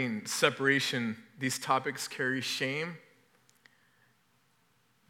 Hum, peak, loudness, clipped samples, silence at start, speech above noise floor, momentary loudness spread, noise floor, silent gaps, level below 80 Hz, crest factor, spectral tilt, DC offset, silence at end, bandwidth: none; -8 dBFS; -31 LUFS; under 0.1%; 0 s; 39 dB; 9 LU; -71 dBFS; none; under -90 dBFS; 26 dB; -3.5 dB/octave; under 0.1%; 2.1 s; 18 kHz